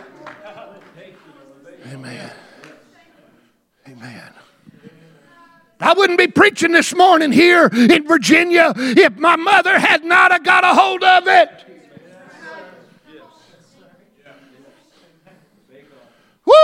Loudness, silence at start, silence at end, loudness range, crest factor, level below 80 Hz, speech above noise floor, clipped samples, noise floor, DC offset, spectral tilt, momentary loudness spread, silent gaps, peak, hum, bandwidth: -12 LUFS; 0.25 s; 0 s; 9 LU; 16 dB; -62 dBFS; 46 dB; under 0.1%; -58 dBFS; under 0.1%; -3.5 dB/octave; 17 LU; none; 0 dBFS; none; 16 kHz